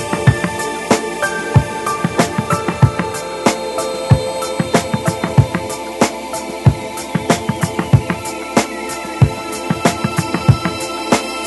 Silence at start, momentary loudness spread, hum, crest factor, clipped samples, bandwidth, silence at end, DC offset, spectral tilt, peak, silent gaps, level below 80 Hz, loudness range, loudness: 0 s; 7 LU; none; 16 dB; 0.2%; 12.5 kHz; 0 s; under 0.1%; -5.5 dB/octave; 0 dBFS; none; -34 dBFS; 1 LU; -17 LUFS